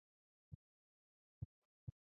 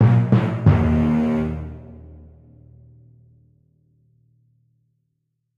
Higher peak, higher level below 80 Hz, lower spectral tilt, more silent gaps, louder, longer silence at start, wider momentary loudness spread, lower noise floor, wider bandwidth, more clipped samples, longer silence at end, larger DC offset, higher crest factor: second, -38 dBFS vs -4 dBFS; second, -70 dBFS vs -38 dBFS; first, -15.5 dB/octave vs -10 dB/octave; first, 0.55-1.87 s vs none; second, -60 LUFS vs -19 LUFS; first, 0.5 s vs 0 s; second, 7 LU vs 24 LU; first, under -90 dBFS vs -74 dBFS; second, 1.2 kHz vs 5 kHz; neither; second, 0.3 s vs 3.45 s; neither; first, 24 dB vs 18 dB